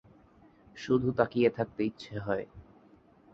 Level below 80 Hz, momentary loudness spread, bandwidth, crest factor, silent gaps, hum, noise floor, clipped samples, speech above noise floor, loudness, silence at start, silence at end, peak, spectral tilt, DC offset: -60 dBFS; 13 LU; 7.6 kHz; 22 dB; none; none; -60 dBFS; under 0.1%; 30 dB; -30 LUFS; 0.75 s; 0.7 s; -10 dBFS; -7.5 dB/octave; under 0.1%